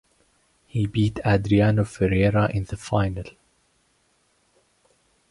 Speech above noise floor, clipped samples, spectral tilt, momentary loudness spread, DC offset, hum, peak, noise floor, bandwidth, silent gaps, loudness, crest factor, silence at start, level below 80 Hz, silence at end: 44 dB; under 0.1%; -7.5 dB/octave; 11 LU; under 0.1%; none; -6 dBFS; -66 dBFS; 11.5 kHz; none; -23 LUFS; 18 dB; 0.75 s; -42 dBFS; 2 s